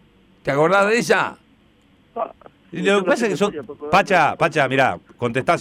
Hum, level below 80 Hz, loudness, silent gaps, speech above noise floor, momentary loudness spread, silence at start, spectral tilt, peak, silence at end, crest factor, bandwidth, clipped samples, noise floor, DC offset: none; -56 dBFS; -19 LUFS; none; 37 dB; 14 LU; 0.45 s; -5 dB/octave; -6 dBFS; 0 s; 14 dB; 16 kHz; under 0.1%; -55 dBFS; under 0.1%